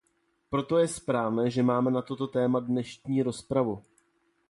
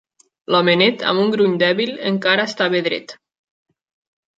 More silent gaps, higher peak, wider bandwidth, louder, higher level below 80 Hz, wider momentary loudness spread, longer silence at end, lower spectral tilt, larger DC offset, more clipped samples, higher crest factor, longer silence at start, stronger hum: neither; second, -14 dBFS vs -2 dBFS; first, 11.5 kHz vs 7.8 kHz; second, -28 LUFS vs -17 LUFS; first, -62 dBFS vs -68 dBFS; about the same, 7 LU vs 6 LU; second, 0.7 s vs 1.25 s; about the same, -6.5 dB/octave vs -5.5 dB/octave; neither; neither; about the same, 14 dB vs 18 dB; about the same, 0.5 s vs 0.5 s; neither